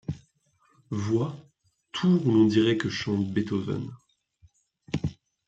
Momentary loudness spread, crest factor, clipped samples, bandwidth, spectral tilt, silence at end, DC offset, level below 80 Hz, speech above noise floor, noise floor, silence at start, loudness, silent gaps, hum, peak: 17 LU; 18 dB; under 0.1%; 8 kHz; -7 dB/octave; 0.35 s; under 0.1%; -58 dBFS; 43 dB; -67 dBFS; 0.1 s; -26 LUFS; none; none; -10 dBFS